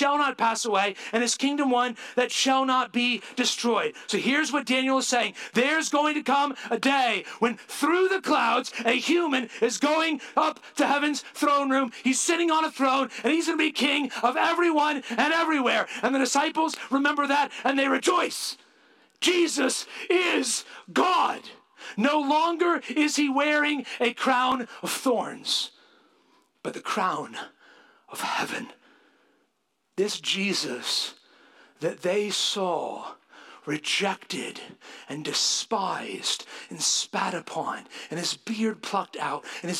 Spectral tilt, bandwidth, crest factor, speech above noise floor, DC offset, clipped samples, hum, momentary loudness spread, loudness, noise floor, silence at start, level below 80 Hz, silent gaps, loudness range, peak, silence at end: -2 dB/octave; 16 kHz; 18 dB; 49 dB; under 0.1%; under 0.1%; none; 10 LU; -25 LUFS; -75 dBFS; 0 s; -82 dBFS; none; 6 LU; -8 dBFS; 0 s